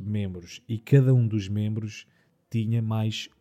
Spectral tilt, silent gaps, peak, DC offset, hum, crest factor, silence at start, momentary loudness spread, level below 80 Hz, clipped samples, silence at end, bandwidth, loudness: -7.5 dB/octave; none; -8 dBFS; under 0.1%; none; 18 dB; 0 s; 15 LU; -66 dBFS; under 0.1%; 0.15 s; 8.4 kHz; -26 LUFS